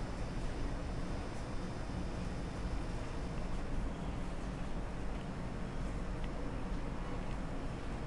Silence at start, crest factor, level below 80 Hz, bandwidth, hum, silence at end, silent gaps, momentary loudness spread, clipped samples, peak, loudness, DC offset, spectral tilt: 0 s; 14 dB; -42 dBFS; 11.5 kHz; none; 0 s; none; 1 LU; under 0.1%; -26 dBFS; -43 LUFS; 0.2%; -6.5 dB/octave